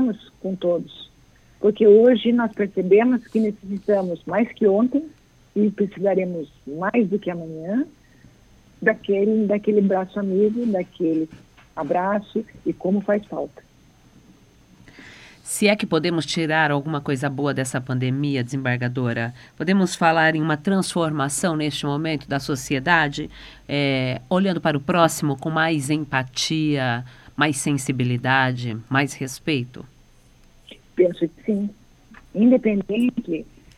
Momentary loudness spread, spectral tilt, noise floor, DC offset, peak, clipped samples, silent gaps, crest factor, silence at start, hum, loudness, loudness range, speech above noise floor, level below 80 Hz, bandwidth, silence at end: 12 LU; -5.5 dB/octave; -53 dBFS; under 0.1%; -2 dBFS; under 0.1%; none; 20 dB; 0 s; none; -21 LUFS; 6 LU; 32 dB; -56 dBFS; 14.5 kHz; 0.35 s